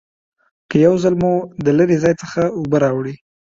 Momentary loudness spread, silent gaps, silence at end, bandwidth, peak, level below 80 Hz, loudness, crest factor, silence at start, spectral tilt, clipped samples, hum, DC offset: 6 LU; none; 0.3 s; 7.6 kHz; -2 dBFS; -50 dBFS; -16 LUFS; 16 dB; 0.7 s; -7.5 dB/octave; under 0.1%; none; under 0.1%